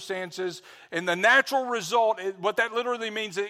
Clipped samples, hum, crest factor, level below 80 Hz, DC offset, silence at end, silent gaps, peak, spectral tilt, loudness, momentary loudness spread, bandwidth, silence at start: under 0.1%; none; 18 dB; -78 dBFS; under 0.1%; 0 s; none; -8 dBFS; -3 dB/octave; -25 LUFS; 14 LU; 16 kHz; 0 s